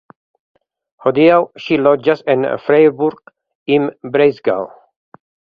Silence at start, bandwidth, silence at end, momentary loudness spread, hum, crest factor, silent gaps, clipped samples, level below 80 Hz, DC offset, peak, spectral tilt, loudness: 1.05 s; 5.2 kHz; 0.9 s; 9 LU; none; 16 dB; 3.55-3.66 s; under 0.1%; -60 dBFS; under 0.1%; 0 dBFS; -8 dB/octave; -14 LUFS